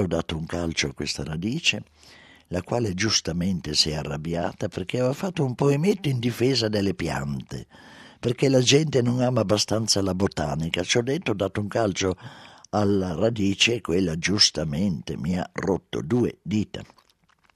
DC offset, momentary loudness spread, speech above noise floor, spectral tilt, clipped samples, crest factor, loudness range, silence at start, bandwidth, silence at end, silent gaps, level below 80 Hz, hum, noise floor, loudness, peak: under 0.1%; 10 LU; 38 dB; -4.5 dB/octave; under 0.1%; 20 dB; 3 LU; 0 s; 14 kHz; 0.7 s; none; -48 dBFS; none; -62 dBFS; -24 LUFS; -4 dBFS